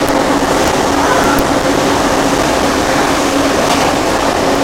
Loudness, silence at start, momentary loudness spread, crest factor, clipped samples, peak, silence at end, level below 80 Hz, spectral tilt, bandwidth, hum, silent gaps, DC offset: -12 LUFS; 0 s; 1 LU; 12 dB; under 0.1%; 0 dBFS; 0 s; -30 dBFS; -3.5 dB/octave; 17 kHz; none; none; under 0.1%